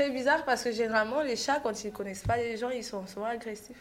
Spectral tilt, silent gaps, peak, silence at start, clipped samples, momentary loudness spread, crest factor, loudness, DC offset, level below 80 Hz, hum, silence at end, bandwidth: -4 dB/octave; none; -14 dBFS; 0 s; under 0.1%; 10 LU; 18 dB; -31 LUFS; under 0.1%; -54 dBFS; none; 0 s; 16 kHz